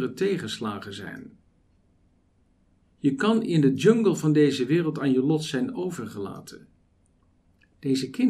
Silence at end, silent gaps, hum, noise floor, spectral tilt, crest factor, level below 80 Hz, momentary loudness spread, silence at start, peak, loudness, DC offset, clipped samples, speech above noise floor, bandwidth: 0 s; none; none; -64 dBFS; -6.5 dB/octave; 20 dB; -66 dBFS; 17 LU; 0 s; -6 dBFS; -24 LUFS; under 0.1%; under 0.1%; 40 dB; 14 kHz